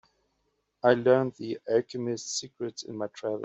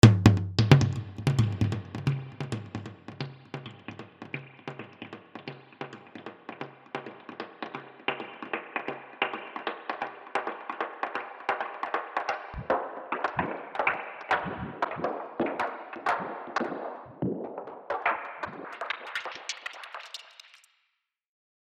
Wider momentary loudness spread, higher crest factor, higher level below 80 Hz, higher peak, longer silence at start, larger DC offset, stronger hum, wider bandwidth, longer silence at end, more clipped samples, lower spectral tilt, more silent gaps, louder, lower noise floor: about the same, 14 LU vs 16 LU; second, 22 dB vs 28 dB; second, -72 dBFS vs -52 dBFS; second, -8 dBFS vs -2 dBFS; first, 0.85 s vs 0.05 s; neither; neither; second, 8.2 kHz vs 11 kHz; second, 0 s vs 1.15 s; neither; second, -4.5 dB/octave vs -6.5 dB/octave; neither; first, -28 LUFS vs -31 LUFS; about the same, -76 dBFS vs -79 dBFS